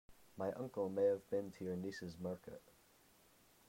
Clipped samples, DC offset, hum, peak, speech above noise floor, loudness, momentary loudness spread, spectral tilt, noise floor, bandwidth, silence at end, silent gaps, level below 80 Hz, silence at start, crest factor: under 0.1%; under 0.1%; none; -26 dBFS; 28 dB; -42 LUFS; 17 LU; -7 dB/octave; -70 dBFS; 16 kHz; 1.1 s; none; -78 dBFS; 0.1 s; 18 dB